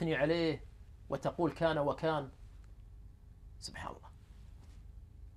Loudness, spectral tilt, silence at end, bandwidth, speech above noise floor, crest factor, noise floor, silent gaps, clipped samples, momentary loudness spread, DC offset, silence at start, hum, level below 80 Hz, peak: -36 LUFS; -6.5 dB/octave; 0 s; 13 kHz; 20 dB; 20 dB; -54 dBFS; none; under 0.1%; 25 LU; under 0.1%; 0 s; none; -54 dBFS; -18 dBFS